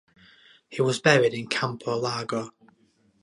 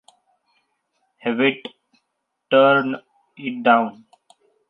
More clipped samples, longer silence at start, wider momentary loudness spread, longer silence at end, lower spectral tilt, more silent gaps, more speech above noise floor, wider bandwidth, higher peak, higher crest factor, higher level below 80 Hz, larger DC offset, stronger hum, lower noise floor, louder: neither; second, 0.7 s vs 1.25 s; second, 13 LU vs 18 LU; about the same, 0.7 s vs 0.8 s; second, -4.5 dB/octave vs -7 dB/octave; neither; second, 39 dB vs 58 dB; first, 11.5 kHz vs 5.4 kHz; about the same, -2 dBFS vs -2 dBFS; about the same, 24 dB vs 20 dB; first, -70 dBFS vs -78 dBFS; neither; neither; second, -64 dBFS vs -76 dBFS; second, -25 LUFS vs -19 LUFS